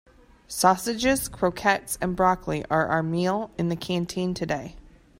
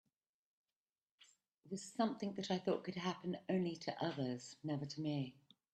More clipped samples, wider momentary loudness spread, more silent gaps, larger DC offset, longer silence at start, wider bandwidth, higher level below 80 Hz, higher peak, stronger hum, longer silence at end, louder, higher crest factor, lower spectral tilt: neither; about the same, 7 LU vs 8 LU; neither; neither; second, 0.5 s vs 1.2 s; first, 16 kHz vs 9.2 kHz; first, -48 dBFS vs -82 dBFS; first, -4 dBFS vs -24 dBFS; neither; about the same, 0.4 s vs 0.45 s; first, -25 LUFS vs -42 LUFS; about the same, 20 dB vs 20 dB; second, -4.5 dB/octave vs -6 dB/octave